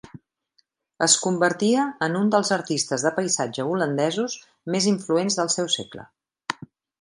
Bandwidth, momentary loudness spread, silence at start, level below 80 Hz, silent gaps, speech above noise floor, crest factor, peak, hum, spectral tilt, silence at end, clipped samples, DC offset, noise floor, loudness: 11.5 kHz; 14 LU; 0.15 s; -68 dBFS; none; 45 dB; 20 dB; -4 dBFS; none; -3.5 dB/octave; 0.45 s; under 0.1%; under 0.1%; -68 dBFS; -23 LUFS